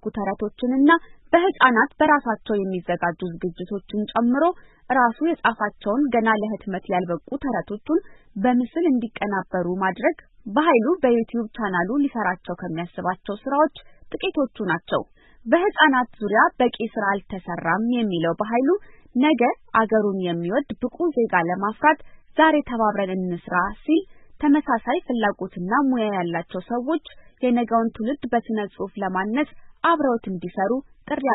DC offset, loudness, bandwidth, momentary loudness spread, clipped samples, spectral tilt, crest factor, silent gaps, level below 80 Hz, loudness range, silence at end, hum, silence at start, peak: under 0.1%; -22 LUFS; 4.1 kHz; 10 LU; under 0.1%; -10.5 dB/octave; 20 dB; none; -52 dBFS; 3 LU; 0 s; none; 0 s; -2 dBFS